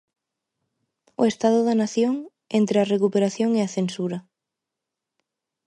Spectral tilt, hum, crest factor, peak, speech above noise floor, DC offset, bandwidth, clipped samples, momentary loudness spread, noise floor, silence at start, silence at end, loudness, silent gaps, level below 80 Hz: -6 dB/octave; none; 18 dB; -6 dBFS; 64 dB; under 0.1%; 11 kHz; under 0.1%; 10 LU; -85 dBFS; 1.2 s; 1.45 s; -22 LUFS; none; -72 dBFS